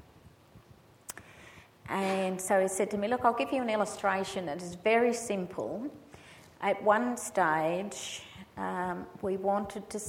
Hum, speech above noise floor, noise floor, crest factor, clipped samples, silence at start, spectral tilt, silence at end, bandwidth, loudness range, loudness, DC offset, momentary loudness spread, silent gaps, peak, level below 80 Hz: none; 27 dB; -58 dBFS; 22 dB; under 0.1%; 0.25 s; -4 dB/octave; 0 s; 17 kHz; 2 LU; -31 LUFS; under 0.1%; 19 LU; none; -10 dBFS; -66 dBFS